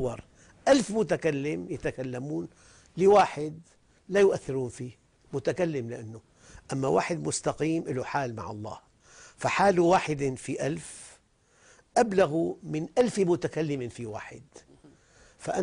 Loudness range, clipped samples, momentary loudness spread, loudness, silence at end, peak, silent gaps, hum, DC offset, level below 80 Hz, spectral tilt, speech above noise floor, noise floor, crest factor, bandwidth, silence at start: 4 LU; under 0.1%; 18 LU; -28 LUFS; 0 s; -10 dBFS; none; none; under 0.1%; -58 dBFS; -5.5 dB/octave; 36 dB; -63 dBFS; 18 dB; 10.5 kHz; 0 s